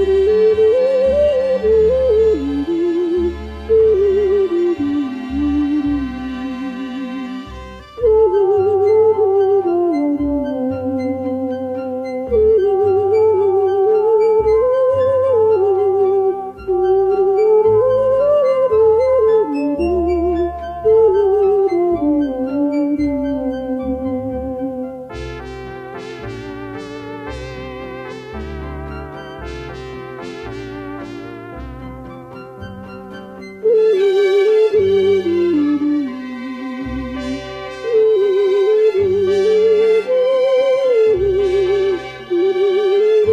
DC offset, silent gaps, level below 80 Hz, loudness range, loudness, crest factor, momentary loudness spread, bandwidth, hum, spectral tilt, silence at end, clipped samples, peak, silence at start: under 0.1%; none; -38 dBFS; 15 LU; -15 LUFS; 12 dB; 16 LU; 7.4 kHz; none; -7.5 dB/octave; 0 s; under 0.1%; -4 dBFS; 0 s